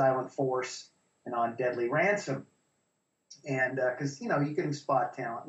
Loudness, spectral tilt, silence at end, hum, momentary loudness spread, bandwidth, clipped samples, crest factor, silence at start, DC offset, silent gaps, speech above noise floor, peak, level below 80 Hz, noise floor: -31 LUFS; -6 dB/octave; 0 s; none; 11 LU; 8.2 kHz; under 0.1%; 16 dB; 0 s; under 0.1%; none; 48 dB; -14 dBFS; -78 dBFS; -78 dBFS